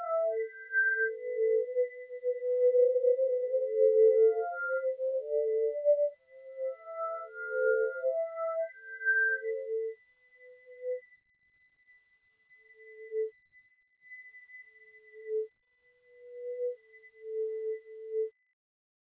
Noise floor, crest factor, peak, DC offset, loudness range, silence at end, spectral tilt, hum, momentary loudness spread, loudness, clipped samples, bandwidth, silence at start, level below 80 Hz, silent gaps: -70 dBFS; 16 dB; -16 dBFS; under 0.1%; 17 LU; 0.75 s; -5 dB/octave; none; 20 LU; -31 LUFS; under 0.1%; 2.1 kHz; 0 s; under -90 dBFS; none